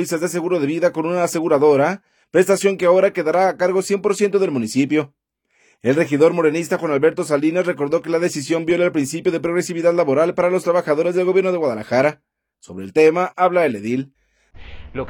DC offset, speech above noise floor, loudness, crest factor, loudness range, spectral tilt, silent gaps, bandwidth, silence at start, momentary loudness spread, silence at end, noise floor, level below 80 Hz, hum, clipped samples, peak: under 0.1%; 45 dB; -18 LUFS; 16 dB; 2 LU; -5.5 dB/octave; none; 19 kHz; 0 s; 6 LU; 0 s; -62 dBFS; -54 dBFS; none; under 0.1%; -2 dBFS